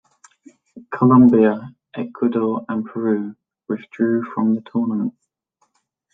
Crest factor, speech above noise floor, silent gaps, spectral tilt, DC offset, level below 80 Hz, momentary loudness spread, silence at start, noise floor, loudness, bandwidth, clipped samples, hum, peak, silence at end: 16 dB; 50 dB; none; -10 dB/octave; under 0.1%; -60 dBFS; 18 LU; 0.75 s; -68 dBFS; -19 LUFS; 3.8 kHz; under 0.1%; none; -4 dBFS; 1.05 s